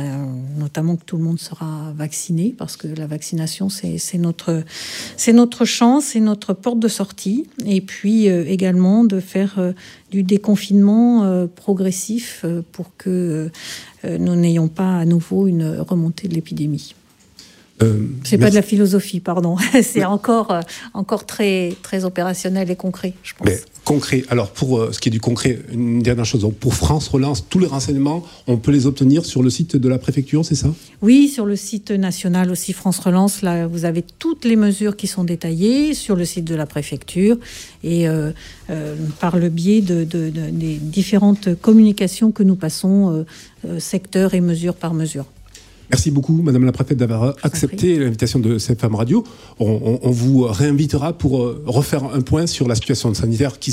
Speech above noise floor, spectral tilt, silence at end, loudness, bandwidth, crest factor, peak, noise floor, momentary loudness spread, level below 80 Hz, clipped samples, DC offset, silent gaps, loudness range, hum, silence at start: 29 dB; -6 dB/octave; 0 s; -18 LUFS; 16 kHz; 16 dB; -2 dBFS; -46 dBFS; 10 LU; -42 dBFS; under 0.1%; under 0.1%; none; 5 LU; none; 0 s